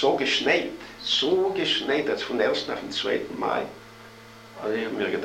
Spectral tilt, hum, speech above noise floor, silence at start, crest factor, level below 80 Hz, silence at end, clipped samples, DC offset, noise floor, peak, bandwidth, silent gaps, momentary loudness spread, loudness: -3.5 dB/octave; none; 21 dB; 0 s; 18 dB; -60 dBFS; 0 s; under 0.1%; under 0.1%; -46 dBFS; -8 dBFS; 15.5 kHz; none; 18 LU; -25 LUFS